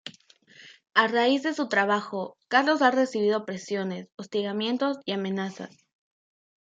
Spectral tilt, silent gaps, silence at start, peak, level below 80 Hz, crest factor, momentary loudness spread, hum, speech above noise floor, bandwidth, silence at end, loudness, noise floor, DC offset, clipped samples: -4.5 dB/octave; 4.14-4.18 s; 0.05 s; -6 dBFS; -80 dBFS; 22 dB; 13 LU; none; 30 dB; 9 kHz; 1.15 s; -26 LUFS; -56 dBFS; under 0.1%; under 0.1%